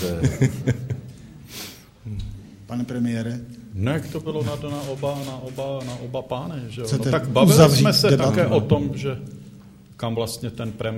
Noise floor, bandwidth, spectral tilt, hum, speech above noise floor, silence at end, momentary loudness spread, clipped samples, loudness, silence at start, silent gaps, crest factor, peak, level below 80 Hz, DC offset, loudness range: -45 dBFS; 16 kHz; -6 dB/octave; none; 24 dB; 0 s; 19 LU; under 0.1%; -22 LUFS; 0 s; none; 22 dB; 0 dBFS; -46 dBFS; under 0.1%; 11 LU